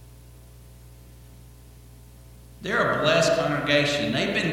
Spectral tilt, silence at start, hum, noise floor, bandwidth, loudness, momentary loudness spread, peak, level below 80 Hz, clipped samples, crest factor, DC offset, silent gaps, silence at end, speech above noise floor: -4 dB/octave; 0 s; none; -47 dBFS; 17 kHz; -22 LUFS; 5 LU; -6 dBFS; -50 dBFS; under 0.1%; 20 dB; under 0.1%; none; 0 s; 25 dB